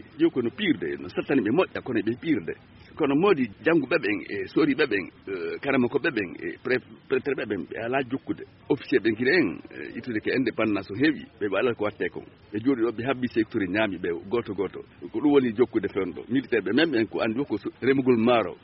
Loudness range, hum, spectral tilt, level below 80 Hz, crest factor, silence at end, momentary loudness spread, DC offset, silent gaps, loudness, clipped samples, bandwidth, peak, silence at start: 3 LU; none; -4.5 dB/octave; -62 dBFS; 18 dB; 0.05 s; 10 LU; under 0.1%; none; -26 LUFS; under 0.1%; 5.8 kHz; -8 dBFS; 0.05 s